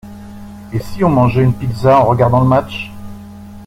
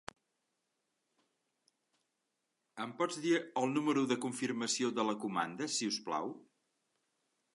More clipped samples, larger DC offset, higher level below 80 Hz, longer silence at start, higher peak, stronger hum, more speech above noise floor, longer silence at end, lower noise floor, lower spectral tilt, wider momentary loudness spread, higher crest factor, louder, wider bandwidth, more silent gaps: neither; neither; first, -38 dBFS vs -84 dBFS; second, 0.05 s vs 2.75 s; first, -2 dBFS vs -18 dBFS; neither; second, 21 dB vs 50 dB; second, 0 s vs 1.15 s; second, -33 dBFS vs -85 dBFS; first, -8.5 dB/octave vs -3.5 dB/octave; first, 23 LU vs 12 LU; second, 14 dB vs 20 dB; first, -13 LUFS vs -35 LUFS; first, 13.5 kHz vs 11.5 kHz; neither